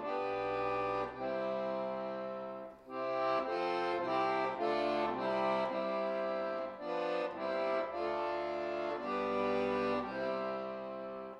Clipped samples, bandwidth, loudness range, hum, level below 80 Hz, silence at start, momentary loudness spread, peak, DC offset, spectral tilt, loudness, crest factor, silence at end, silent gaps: under 0.1%; 9.8 kHz; 3 LU; none; -68 dBFS; 0 s; 7 LU; -22 dBFS; under 0.1%; -6 dB/octave; -36 LUFS; 14 dB; 0 s; none